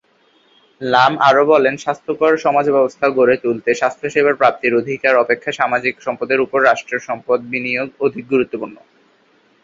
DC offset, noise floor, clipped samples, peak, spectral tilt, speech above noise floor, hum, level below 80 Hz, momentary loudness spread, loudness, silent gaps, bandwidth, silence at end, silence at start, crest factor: under 0.1%; -56 dBFS; under 0.1%; 0 dBFS; -5 dB/octave; 40 dB; none; -62 dBFS; 9 LU; -16 LUFS; none; 7.8 kHz; 0.9 s; 0.8 s; 16 dB